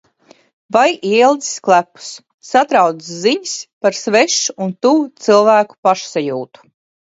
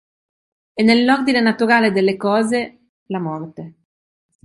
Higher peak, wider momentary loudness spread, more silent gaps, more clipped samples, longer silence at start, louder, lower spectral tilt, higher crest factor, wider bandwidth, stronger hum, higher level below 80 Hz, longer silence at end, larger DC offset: about the same, 0 dBFS vs -2 dBFS; second, 12 LU vs 17 LU; about the same, 2.34-2.38 s, 3.73-3.81 s, 5.78-5.83 s vs 2.89-3.06 s; neither; about the same, 0.7 s vs 0.75 s; about the same, -14 LUFS vs -16 LUFS; second, -3 dB/octave vs -5.5 dB/octave; about the same, 16 dB vs 16 dB; second, 8 kHz vs 11.5 kHz; neither; second, -68 dBFS vs -62 dBFS; second, 0.55 s vs 0.75 s; neither